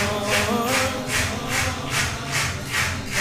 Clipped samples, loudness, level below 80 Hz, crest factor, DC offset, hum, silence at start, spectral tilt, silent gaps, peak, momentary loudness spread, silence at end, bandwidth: under 0.1%; -22 LUFS; -40 dBFS; 18 dB; under 0.1%; none; 0 s; -3 dB/octave; none; -6 dBFS; 3 LU; 0 s; 16 kHz